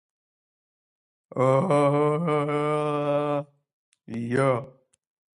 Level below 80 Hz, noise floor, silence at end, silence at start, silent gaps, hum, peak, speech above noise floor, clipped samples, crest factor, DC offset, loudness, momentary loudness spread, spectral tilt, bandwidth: -70 dBFS; under -90 dBFS; 0.7 s; 1.35 s; 3.73-3.92 s; none; -10 dBFS; over 67 dB; under 0.1%; 16 dB; under 0.1%; -24 LUFS; 10 LU; -7.5 dB/octave; 10.5 kHz